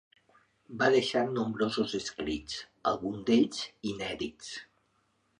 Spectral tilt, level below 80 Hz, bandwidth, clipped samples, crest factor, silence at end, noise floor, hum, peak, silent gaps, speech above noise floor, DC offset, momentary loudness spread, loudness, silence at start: -4.5 dB/octave; -60 dBFS; 11 kHz; under 0.1%; 20 dB; 0.75 s; -73 dBFS; none; -12 dBFS; none; 42 dB; under 0.1%; 14 LU; -31 LUFS; 0.7 s